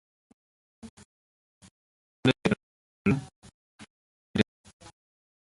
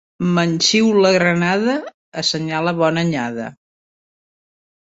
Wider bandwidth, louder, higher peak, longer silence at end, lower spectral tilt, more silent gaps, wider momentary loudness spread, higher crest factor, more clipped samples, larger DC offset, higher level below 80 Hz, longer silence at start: first, 11.5 kHz vs 8 kHz; second, -29 LUFS vs -17 LUFS; second, -6 dBFS vs 0 dBFS; second, 1 s vs 1.35 s; first, -6.5 dB/octave vs -4.5 dB/octave; first, 0.90-0.97 s, 1.05-1.61 s, 1.71-2.23 s, 2.63-3.05 s, 3.36-3.42 s, 3.54-3.79 s, 3.90-4.34 s vs 1.94-2.12 s; first, 24 LU vs 12 LU; first, 26 dB vs 18 dB; neither; neither; about the same, -58 dBFS vs -58 dBFS; first, 0.85 s vs 0.2 s